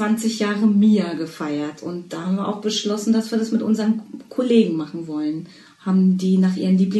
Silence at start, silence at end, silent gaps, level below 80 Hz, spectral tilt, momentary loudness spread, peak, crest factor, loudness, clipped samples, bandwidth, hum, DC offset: 0 s; 0 s; none; -68 dBFS; -6.5 dB/octave; 11 LU; -4 dBFS; 16 dB; -20 LUFS; under 0.1%; 12.5 kHz; none; under 0.1%